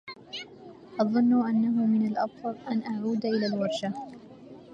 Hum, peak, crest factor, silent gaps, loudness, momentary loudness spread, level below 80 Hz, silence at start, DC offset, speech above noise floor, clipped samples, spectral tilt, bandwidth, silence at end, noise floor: none; -10 dBFS; 18 dB; none; -27 LUFS; 21 LU; -74 dBFS; 0.05 s; under 0.1%; 22 dB; under 0.1%; -7 dB/octave; 7.8 kHz; 0 s; -48 dBFS